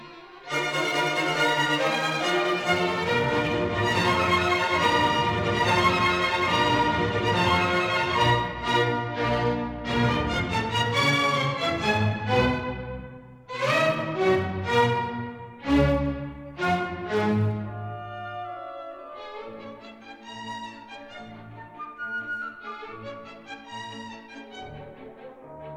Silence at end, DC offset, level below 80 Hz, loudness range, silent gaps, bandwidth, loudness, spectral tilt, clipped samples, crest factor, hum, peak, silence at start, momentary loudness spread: 0 s; under 0.1%; -46 dBFS; 15 LU; none; 18.5 kHz; -24 LUFS; -5 dB/octave; under 0.1%; 18 dB; none; -8 dBFS; 0 s; 20 LU